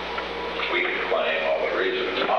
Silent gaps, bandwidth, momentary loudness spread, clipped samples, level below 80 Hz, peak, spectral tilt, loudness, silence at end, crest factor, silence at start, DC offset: none; 9 kHz; 6 LU; under 0.1%; -52 dBFS; -10 dBFS; -4.5 dB/octave; -24 LUFS; 0 s; 14 dB; 0 s; 0.1%